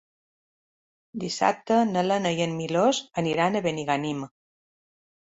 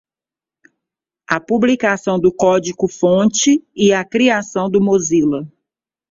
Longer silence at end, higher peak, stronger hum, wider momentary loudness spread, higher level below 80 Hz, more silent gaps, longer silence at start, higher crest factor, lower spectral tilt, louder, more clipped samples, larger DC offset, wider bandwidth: first, 1.05 s vs 0.65 s; second, -8 dBFS vs 0 dBFS; neither; first, 11 LU vs 7 LU; second, -68 dBFS vs -54 dBFS; neither; second, 1.15 s vs 1.3 s; about the same, 20 dB vs 16 dB; about the same, -5 dB/octave vs -4.5 dB/octave; second, -25 LUFS vs -15 LUFS; neither; neither; about the same, 8 kHz vs 7.8 kHz